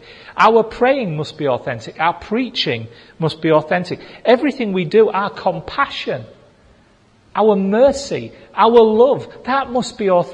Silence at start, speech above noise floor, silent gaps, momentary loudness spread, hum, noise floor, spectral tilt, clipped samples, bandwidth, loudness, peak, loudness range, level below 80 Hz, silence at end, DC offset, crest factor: 0.1 s; 36 dB; none; 13 LU; none; -52 dBFS; -5.5 dB/octave; under 0.1%; 9.8 kHz; -16 LUFS; 0 dBFS; 4 LU; -50 dBFS; 0 s; under 0.1%; 16 dB